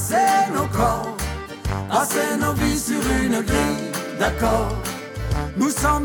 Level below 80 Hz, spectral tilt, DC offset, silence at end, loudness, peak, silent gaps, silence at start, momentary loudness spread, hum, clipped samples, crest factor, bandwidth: -32 dBFS; -4.5 dB/octave; under 0.1%; 0 s; -22 LUFS; -6 dBFS; none; 0 s; 9 LU; none; under 0.1%; 16 dB; 19 kHz